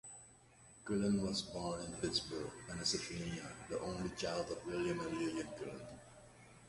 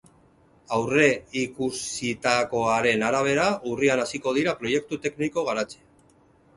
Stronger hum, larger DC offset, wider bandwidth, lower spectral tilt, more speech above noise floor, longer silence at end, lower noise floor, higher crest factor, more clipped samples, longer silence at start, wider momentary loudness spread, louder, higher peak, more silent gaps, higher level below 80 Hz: neither; neither; about the same, 11.5 kHz vs 11.5 kHz; about the same, -4 dB/octave vs -4 dB/octave; second, 22 dB vs 34 dB; second, 0 s vs 0.8 s; first, -63 dBFS vs -58 dBFS; about the same, 18 dB vs 22 dB; neither; second, 0.05 s vs 0.7 s; first, 19 LU vs 8 LU; second, -41 LUFS vs -24 LUFS; second, -24 dBFS vs -4 dBFS; neither; about the same, -62 dBFS vs -60 dBFS